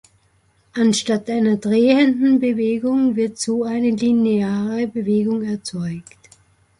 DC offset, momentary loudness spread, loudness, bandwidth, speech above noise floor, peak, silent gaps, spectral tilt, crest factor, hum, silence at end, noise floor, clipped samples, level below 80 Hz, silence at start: under 0.1%; 10 LU; -18 LUFS; 11.5 kHz; 42 dB; -4 dBFS; none; -5.5 dB/octave; 16 dB; none; 0.8 s; -60 dBFS; under 0.1%; -58 dBFS; 0.75 s